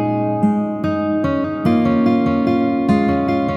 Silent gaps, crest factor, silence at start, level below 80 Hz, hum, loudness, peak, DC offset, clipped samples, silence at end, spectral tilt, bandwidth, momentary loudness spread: none; 12 dB; 0 s; -44 dBFS; none; -17 LUFS; -4 dBFS; under 0.1%; under 0.1%; 0 s; -9 dB/octave; 7.2 kHz; 4 LU